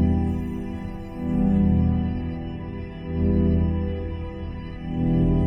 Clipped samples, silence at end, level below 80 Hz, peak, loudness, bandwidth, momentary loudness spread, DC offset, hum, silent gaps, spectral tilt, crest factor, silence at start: under 0.1%; 0 s; -30 dBFS; -10 dBFS; -25 LUFS; 5 kHz; 13 LU; under 0.1%; none; none; -10.5 dB/octave; 14 dB; 0 s